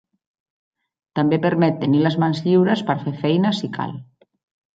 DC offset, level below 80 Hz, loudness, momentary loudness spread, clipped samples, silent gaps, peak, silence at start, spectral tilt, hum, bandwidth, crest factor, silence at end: under 0.1%; -64 dBFS; -19 LUFS; 11 LU; under 0.1%; none; -4 dBFS; 1.15 s; -8 dB/octave; none; 7.8 kHz; 16 dB; 0.7 s